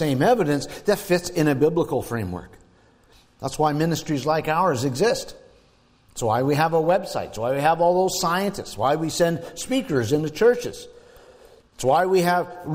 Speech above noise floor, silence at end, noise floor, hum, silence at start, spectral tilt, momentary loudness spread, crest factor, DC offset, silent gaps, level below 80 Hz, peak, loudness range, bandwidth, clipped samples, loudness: 36 dB; 0 s; -58 dBFS; none; 0 s; -5.5 dB/octave; 10 LU; 14 dB; under 0.1%; none; -52 dBFS; -8 dBFS; 3 LU; 16 kHz; under 0.1%; -22 LUFS